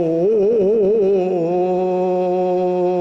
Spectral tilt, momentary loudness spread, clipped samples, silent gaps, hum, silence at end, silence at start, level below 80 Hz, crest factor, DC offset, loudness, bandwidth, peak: -9.5 dB/octave; 3 LU; under 0.1%; none; none; 0 s; 0 s; -56 dBFS; 6 dB; under 0.1%; -17 LUFS; 6.2 kHz; -10 dBFS